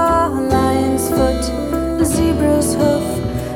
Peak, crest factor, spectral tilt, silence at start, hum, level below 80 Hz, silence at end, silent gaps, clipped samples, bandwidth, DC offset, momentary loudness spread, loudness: -2 dBFS; 14 dB; -5.5 dB/octave; 0 s; none; -28 dBFS; 0 s; none; under 0.1%; 18.5 kHz; under 0.1%; 5 LU; -16 LUFS